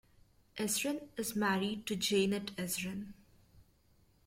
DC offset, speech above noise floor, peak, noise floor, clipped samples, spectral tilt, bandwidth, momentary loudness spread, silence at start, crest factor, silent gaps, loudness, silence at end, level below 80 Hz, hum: under 0.1%; 33 dB; -20 dBFS; -69 dBFS; under 0.1%; -3.5 dB/octave; 16.5 kHz; 11 LU; 0.55 s; 18 dB; none; -35 LUFS; 0.65 s; -68 dBFS; none